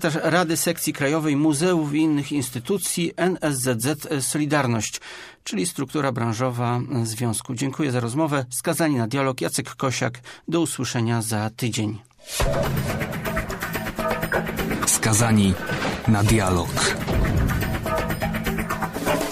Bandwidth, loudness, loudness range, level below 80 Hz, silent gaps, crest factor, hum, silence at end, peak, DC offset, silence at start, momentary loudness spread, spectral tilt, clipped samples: 15.5 kHz; -23 LUFS; 5 LU; -38 dBFS; none; 18 dB; none; 0 s; -6 dBFS; under 0.1%; 0 s; 7 LU; -4.5 dB/octave; under 0.1%